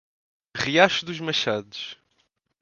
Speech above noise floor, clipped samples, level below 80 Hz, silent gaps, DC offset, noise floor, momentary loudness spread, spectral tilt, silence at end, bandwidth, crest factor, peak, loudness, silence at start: 47 dB; under 0.1%; -62 dBFS; none; under 0.1%; -71 dBFS; 17 LU; -3.5 dB/octave; 0.65 s; 7.4 kHz; 26 dB; 0 dBFS; -22 LUFS; 0.55 s